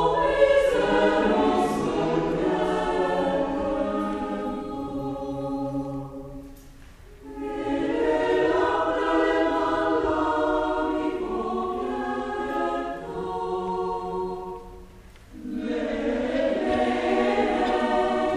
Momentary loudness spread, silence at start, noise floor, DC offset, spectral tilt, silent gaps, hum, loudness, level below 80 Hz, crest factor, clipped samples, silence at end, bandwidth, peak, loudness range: 11 LU; 0 s; -47 dBFS; under 0.1%; -6 dB/octave; none; none; -25 LUFS; -46 dBFS; 18 dB; under 0.1%; 0 s; 13 kHz; -6 dBFS; 8 LU